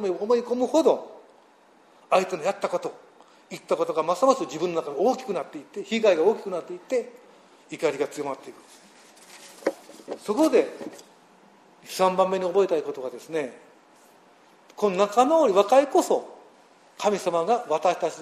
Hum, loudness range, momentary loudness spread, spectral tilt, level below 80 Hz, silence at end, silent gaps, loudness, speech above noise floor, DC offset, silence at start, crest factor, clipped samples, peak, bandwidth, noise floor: none; 6 LU; 18 LU; -4.5 dB/octave; -76 dBFS; 0 s; none; -24 LUFS; 33 dB; under 0.1%; 0 s; 20 dB; under 0.1%; -6 dBFS; 14 kHz; -57 dBFS